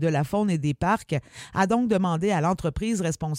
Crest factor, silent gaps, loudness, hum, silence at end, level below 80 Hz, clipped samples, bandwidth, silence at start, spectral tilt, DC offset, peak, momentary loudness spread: 16 dB; none; -25 LUFS; none; 0 s; -46 dBFS; under 0.1%; 16 kHz; 0 s; -6.5 dB/octave; under 0.1%; -8 dBFS; 5 LU